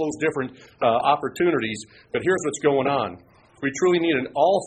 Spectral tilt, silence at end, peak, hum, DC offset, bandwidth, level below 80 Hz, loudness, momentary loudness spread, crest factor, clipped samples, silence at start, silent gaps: -5 dB/octave; 0 s; -6 dBFS; none; under 0.1%; 9.4 kHz; -60 dBFS; -23 LUFS; 10 LU; 18 dB; under 0.1%; 0 s; none